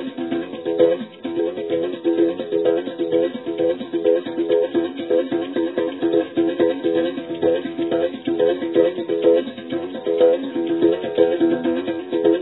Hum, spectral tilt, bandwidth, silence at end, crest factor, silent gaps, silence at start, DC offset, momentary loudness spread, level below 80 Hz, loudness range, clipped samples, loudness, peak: none; -10 dB/octave; 4.1 kHz; 0 s; 18 dB; none; 0 s; under 0.1%; 7 LU; -66 dBFS; 2 LU; under 0.1%; -21 LUFS; -2 dBFS